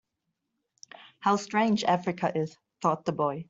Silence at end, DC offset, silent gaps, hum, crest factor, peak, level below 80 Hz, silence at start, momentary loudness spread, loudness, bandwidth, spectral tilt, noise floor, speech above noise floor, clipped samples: 0.05 s; under 0.1%; none; none; 20 dB; -10 dBFS; -72 dBFS; 1 s; 11 LU; -28 LUFS; 8 kHz; -5.5 dB/octave; -82 dBFS; 55 dB; under 0.1%